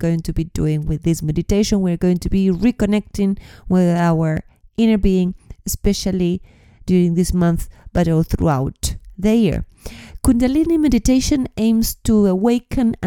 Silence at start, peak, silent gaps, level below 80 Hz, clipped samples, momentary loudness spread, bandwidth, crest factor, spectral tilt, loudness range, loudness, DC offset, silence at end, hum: 0 s; 0 dBFS; none; -30 dBFS; under 0.1%; 10 LU; 18 kHz; 18 dB; -6.5 dB/octave; 2 LU; -18 LUFS; under 0.1%; 0 s; none